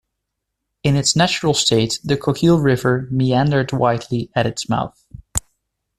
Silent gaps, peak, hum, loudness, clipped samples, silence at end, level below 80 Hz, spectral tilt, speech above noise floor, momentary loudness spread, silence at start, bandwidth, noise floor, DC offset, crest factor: none; 0 dBFS; none; -18 LUFS; under 0.1%; 0.6 s; -44 dBFS; -5 dB/octave; 61 dB; 9 LU; 0.85 s; 14 kHz; -78 dBFS; under 0.1%; 18 dB